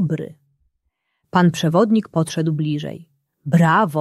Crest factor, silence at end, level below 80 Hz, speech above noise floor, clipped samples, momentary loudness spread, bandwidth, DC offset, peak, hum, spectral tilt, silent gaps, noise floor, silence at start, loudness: 18 dB; 0 s; -60 dBFS; 55 dB; under 0.1%; 18 LU; 12.5 kHz; under 0.1%; -2 dBFS; none; -7 dB/octave; none; -72 dBFS; 0 s; -18 LUFS